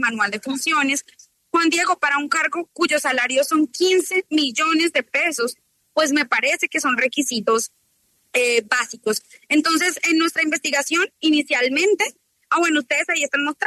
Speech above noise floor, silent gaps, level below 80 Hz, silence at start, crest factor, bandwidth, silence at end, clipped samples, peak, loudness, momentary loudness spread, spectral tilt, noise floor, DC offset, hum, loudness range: 44 dB; none; -74 dBFS; 0 s; 14 dB; 13.5 kHz; 0 s; under 0.1%; -6 dBFS; -19 LUFS; 5 LU; -1 dB/octave; -64 dBFS; under 0.1%; none; 2 LU